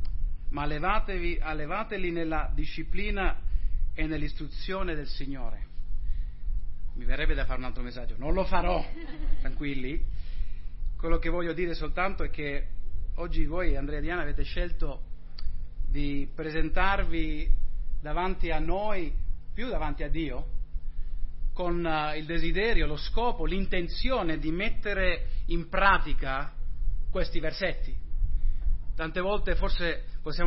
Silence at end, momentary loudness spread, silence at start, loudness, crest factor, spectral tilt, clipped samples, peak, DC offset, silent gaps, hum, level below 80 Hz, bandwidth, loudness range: 0 s; 12 LU; 0 s; -32 LUFS; 18 dB; -9.5 dB/octave; under 0.1%; -8 dBFS; under 0.1%; none; none; -28 dBFS; 5.8 kHz; 6 LU